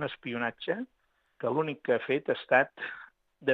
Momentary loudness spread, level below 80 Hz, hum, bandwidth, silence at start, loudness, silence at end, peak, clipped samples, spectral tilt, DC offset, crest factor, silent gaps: 14 LU; -78 dBFS; none; 5.8 kHz; 0 s; -31 LUFS; 0 s; -10 dBFS; under 0.1%; -7.5 dB/octave; under 0.1%; 22 dB; none